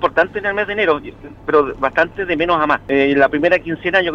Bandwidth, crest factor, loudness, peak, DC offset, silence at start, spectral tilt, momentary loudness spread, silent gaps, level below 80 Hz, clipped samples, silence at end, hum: 7.4 kHz; 16 dB; -16 LUFS; 0 dBFS; under 0.1%; 0 s; -6.5 dB/octave; 5 LU; none; -44 dBFS; under 0.1%; 0 s; none